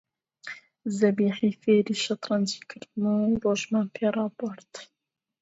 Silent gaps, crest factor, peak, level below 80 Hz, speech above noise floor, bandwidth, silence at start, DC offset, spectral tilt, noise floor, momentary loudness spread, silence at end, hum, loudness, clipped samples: none; 18 dB; -10 dBFS; -64 dBFS; 19 dB; 8 kHz; 0.45 s; under 0.1%; -5.5 dB/octave; -44 dBFS; 18 LU; 0.6 s; none; -26 LUFS; under 0.1%